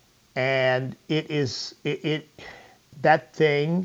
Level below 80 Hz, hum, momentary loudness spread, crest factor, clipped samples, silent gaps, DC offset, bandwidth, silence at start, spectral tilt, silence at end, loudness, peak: -68 dBFS; none; 12 LU; 20 dB; under 0.1%; none; under 0.1%; 8 kHz; 0.35 s; -5.5 dB/octave; 0 s; -25 LUFS; -4 dBFS